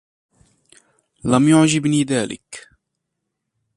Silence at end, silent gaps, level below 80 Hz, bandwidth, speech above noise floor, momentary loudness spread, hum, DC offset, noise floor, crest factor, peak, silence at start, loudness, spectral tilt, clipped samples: 1.15 s; none; -54 dBFS; 11.5 kHz; 61 dB; 22 LU; none; under 0.1%; -78 dBFS; 20 dB; 0 dBFS; 1.25 s; -17 LUFS; -5 dB/octave; under 0.1%